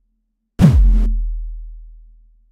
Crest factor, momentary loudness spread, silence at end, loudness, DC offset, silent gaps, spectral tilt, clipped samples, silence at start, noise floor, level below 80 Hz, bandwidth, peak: 16 dB; 21 LU; 0.6 s; -16 LUFS; under 0.1%; none; -8.5 dB/octave; under 0.1%; 0.6 s; -69 dBFS; -18 dBFS; 7.2 kHz; 0 dBFS